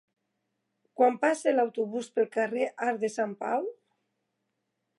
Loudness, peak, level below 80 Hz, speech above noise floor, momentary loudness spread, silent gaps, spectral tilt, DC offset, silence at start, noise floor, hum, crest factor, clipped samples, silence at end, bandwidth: -28 LUFS; -10 dBFS; -88 dBFS; 53 dB; 8 LU; none; -4.5 dB/octave; under 0.1%; 1 s; -81 dBFS; none; 20 dB; under 0.1%; 1.25 s; 11.5 kHz